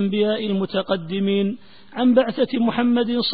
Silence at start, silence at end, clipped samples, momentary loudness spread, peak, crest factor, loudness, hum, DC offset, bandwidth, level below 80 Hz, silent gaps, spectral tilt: 0 s; 0 s; under 0.1%; 7 LU; -4 dBFS; 16 dB; -21 LUFS; none; 0.6%; 4.9 kHz; -60 dBFS; none; -11 dB/octave